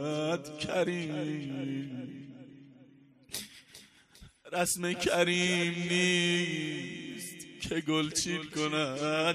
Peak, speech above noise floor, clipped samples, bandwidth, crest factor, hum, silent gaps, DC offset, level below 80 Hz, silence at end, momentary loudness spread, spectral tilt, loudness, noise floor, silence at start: -14 dBFS; 27 dB; under 0.1%; 15 kHz; 20 dB; none; none; under 0.1%; -64 dBFS; 0 s; 15 LU; -3.5 dB/octave; -31 LUFS; -59 dBFS; 0 s